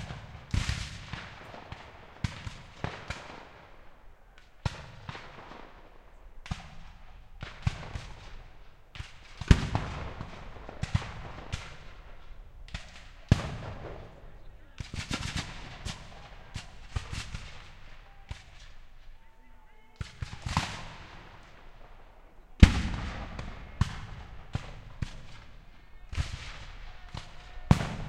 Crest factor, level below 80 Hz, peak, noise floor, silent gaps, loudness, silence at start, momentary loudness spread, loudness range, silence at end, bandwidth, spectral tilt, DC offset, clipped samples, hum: 32 dB; -38 dBFS; -2 dBFS; -54 dBFS; none; -34 LUFS; 0 s; 24 LU; 14 LU; 0 s; 12.5 kHz; -5.5 dB/octave; under 0.1%; under 0.1%; none